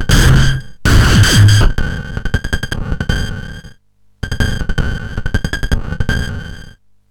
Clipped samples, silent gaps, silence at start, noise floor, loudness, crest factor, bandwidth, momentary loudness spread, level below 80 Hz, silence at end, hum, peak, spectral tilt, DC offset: under 0.1%; none; 0 s; -50 dBFS; -15 LUFS; 14 dB; 19.5 kHz; 16 LU; -18 dBFS; 0.4 s; none; 0 dBFS; -4.5 dB/octave; under 0.1%